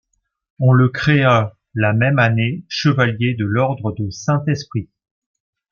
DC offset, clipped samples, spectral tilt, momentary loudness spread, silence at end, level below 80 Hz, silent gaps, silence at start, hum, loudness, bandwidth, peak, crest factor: under 0.1%; under 0.1%; -7 dB/octave; 10 LU; 0.9 s; -52 dBFS; none; 0.6 s; none; -17 LUFS; 7 kHz; -2 dBFS; 16 dB